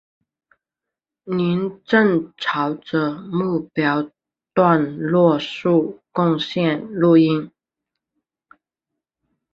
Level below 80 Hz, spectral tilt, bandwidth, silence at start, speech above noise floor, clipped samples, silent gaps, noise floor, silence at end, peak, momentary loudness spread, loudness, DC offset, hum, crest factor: -62 dBFS; -8 dB/octave; 7 kHz; 1.25 s; 68 dB; under 0.1%; none; -86 dBFS; 2.05 s; -2 dBFS; 9 LU; -19 LUFS; under 0.1%; none; 18 dB